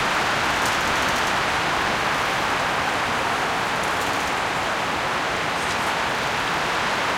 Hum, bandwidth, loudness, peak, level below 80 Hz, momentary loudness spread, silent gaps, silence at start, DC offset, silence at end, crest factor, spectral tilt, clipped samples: none; 17 kHz; -22 LUFS; -8 dBFS; -46 dBFS; 2 LU; none; 0 s; under 0.1%; 0 s; 14 dB; -2.5 dB/octave; under 0.1%